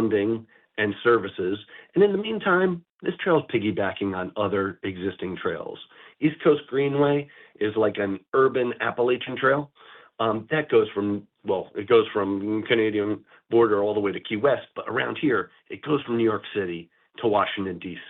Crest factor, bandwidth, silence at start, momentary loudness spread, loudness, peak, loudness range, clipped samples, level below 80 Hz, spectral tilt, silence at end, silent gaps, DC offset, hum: 16 dB; 4.2 kHz; 0 s; 10 LU; -25 LUFS; -8 dBFS; 3 LU; under 0.1%; -68 dBFS; -9.5 dB/octave; 0 s; 2.90-2.99 s, 8.28-8.32 s; under 0.1%; none